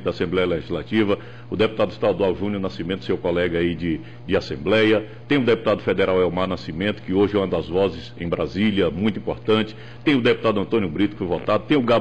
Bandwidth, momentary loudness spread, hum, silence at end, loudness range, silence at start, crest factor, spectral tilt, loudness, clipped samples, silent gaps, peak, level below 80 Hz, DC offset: 8.4 kHz; 8 LU; none; 0 s; 2 LU; 0 s; 14 dB; -7.5 dB/octave; -22 LUFS; under 0.1%; none; -8 dBFS; -48 dBFS; 0.8%